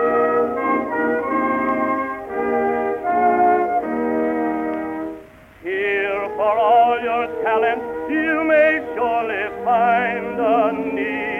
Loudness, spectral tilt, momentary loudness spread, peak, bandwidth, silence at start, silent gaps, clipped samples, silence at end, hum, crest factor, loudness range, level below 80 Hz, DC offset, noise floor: -19 LUFS; -7 dB/octave; 9 LU; -6 dBFS; 4.1 kHz; 0 s; none; under 0.1%; 0 s; none; 14 dB; 3 LU; -54 dBFS; under 0.1%; -41 dBFS